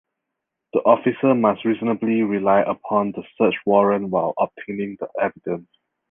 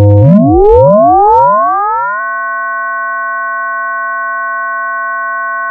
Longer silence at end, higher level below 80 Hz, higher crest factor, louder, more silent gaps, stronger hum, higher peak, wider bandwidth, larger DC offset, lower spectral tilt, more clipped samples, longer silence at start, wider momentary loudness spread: first, 0.5 s vs 0 s; second, -62 dBFS vs -28 dBFS; first, 18 dB vs 10 dB; second, -21 LUFS vs -10 LUFS; neither; neither; about the same, -2 dBFS vs 0 dBFS; about the same, 3.7 kHz vs 3.4 kHz; neither; second, -10 dB/octave vs -11.5 dB/octave; second, under 0.1% vs 0.5%; first, 0.75 s vs 0 s; about the same, 11 LU vs 10 LU